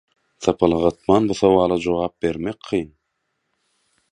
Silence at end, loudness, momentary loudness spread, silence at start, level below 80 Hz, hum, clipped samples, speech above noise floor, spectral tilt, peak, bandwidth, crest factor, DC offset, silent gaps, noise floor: 1.3 s; -20 LUFS; 9 LU; 0.4 s; -46 dBFS; none; under 0.1%; 55 dB; -6.5 dB/octave; 0 dBFS; 10.5 kHz; 20 dB; under 0.1%; none; -74 dBFS